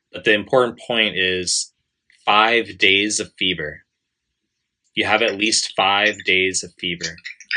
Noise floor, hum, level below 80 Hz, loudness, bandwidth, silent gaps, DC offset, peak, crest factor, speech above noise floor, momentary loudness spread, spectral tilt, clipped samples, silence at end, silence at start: -77 dBFS; none; -62 dBFS; -18 LUFS; 10.5 kHz; none; under 0.1%; 0 dBFS; 20 dB; 58 dB; 12 LU; -1.5 dB/octave; under 0.1%; 0 s; 0.15 s